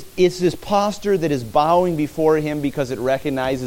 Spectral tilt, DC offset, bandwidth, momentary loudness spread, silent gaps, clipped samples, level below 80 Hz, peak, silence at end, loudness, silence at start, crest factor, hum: -6 dB/octave; under 0.1%; 17 kHz; 6 LU; none; under 0.1%; -46 dBFS; -4 dBFS; 0 s; -19 LUFS; 0 s; 16 dB; none